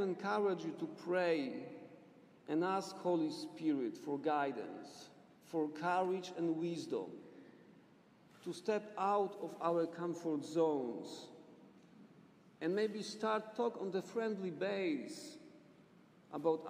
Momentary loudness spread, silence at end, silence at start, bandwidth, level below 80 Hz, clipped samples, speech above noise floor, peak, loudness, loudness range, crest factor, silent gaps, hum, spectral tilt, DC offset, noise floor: 16 LU; 0 s; 0 s; 15 kHz; under -90 dBFS; under 0.1%; 27 dB; -22 dBFS; -39 LUFS; 3 LU; 18 dB; none; none; -6 dB/octave; under 0.1%; -65 dBFS